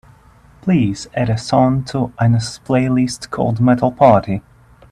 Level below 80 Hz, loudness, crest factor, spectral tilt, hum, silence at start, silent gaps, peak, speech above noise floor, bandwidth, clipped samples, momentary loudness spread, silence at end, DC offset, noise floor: -44 dBFS; -16 LUFS; 16 dB; -7 dB/octave; none; 0.65 s; none; 0 dBFS; 32 dB; 11 kHz; under 0.1%; 9 LU; 0.5 s; under 0.1%; -47 dBFS